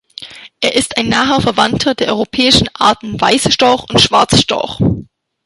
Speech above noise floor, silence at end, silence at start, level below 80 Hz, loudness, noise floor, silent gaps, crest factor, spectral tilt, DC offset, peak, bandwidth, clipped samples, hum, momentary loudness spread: 21 dB; 0.4 s; 0.2 s; -36 dBFS; -12 LUFS; -33 dBFS; none; 14 dB; -4 dB/octave; under 0.1%; 0 dBFS; 12.5 kHz; under 0.1%; none; 7 LU